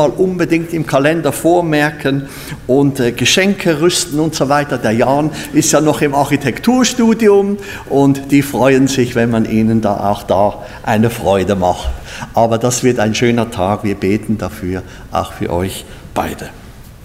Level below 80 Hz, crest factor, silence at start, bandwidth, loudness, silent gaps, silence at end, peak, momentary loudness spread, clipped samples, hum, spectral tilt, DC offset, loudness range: -36 dBFS; 14 dB; 0 s; 16 kHz; -14 LUFS; none; 0 s; 0 dBFS; 10 LU; under 0.1%; none; -5 dB/octave; under 0.1%; 4 LU